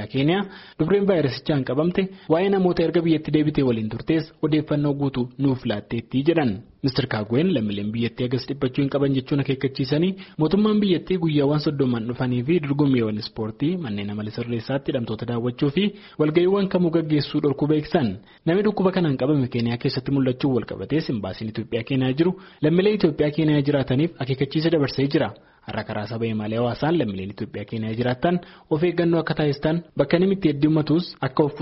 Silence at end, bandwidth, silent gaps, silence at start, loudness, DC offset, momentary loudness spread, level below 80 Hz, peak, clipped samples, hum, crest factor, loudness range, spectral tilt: 0 s; 6 kHz; none; 0 s; -23 LUFS; under 0.1%; 8 LU; -52 dBFS; -6 dBFS; under 0.1%; none; 16 dB; 3 LU; -6.5 dB/octave